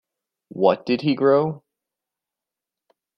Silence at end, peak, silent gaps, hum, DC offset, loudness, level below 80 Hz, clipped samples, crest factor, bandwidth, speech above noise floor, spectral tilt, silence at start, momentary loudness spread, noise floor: 1.6 s; -2 dBFS; none; none; under 0.1%; -20 LUFS; -68 dBFS; under 0.1%; 20 dB; 6 kHz; 68 dB; -8.5 dB/octave; 0.55 s; 18 LU; -88 dBFS